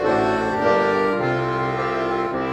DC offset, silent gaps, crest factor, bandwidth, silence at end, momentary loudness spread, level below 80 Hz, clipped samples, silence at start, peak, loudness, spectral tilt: under 0.1%; none; 14 dB; 12 kHz; 0 s; 4 LU; -48 dBFS; under 0.1%; 0 s; -6 dBFS; -21 LUFS; -6.5 dB/octave